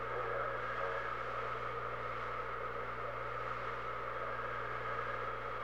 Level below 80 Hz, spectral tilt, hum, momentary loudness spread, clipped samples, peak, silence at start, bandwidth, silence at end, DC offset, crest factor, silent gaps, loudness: -60 dBFS; -5.5 dB/octave; 60 Hz at -55 dBFS; 3 LU; under 0.1%; -24 dBFS; 0 s; 19.5 kHz; 0 s; 0.3%; 16 dB; none; -40 LUFS